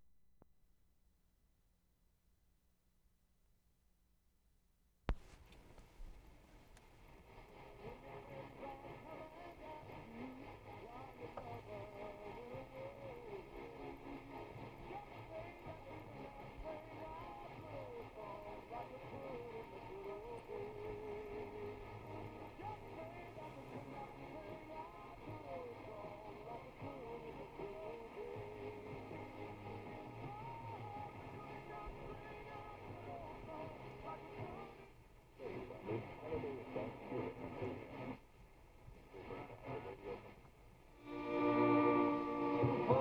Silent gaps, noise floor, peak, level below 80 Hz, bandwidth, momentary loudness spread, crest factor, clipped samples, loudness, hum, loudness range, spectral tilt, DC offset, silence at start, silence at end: none; -77 dBFS; -18 dBFS; -62 dBFS; 18.5 kHz; 13 LU; 28 dB; under 0.1%; -47 LUFS; none; 9 LU; -8 dB/octave; under 0.1%; 0 s; 0 s